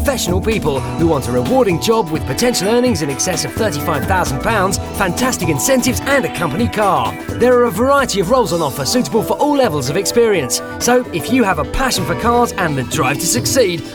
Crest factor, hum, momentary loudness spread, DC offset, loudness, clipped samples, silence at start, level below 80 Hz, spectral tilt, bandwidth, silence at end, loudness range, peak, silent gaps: 14 dB; none; 4 LU; under 0.1%; -15 LUFS; under 0.1%; 0 s; -34 dBFS; -4 dB/octave; over 20 kHz; 0 s; 1 LU; 0 dBFS; none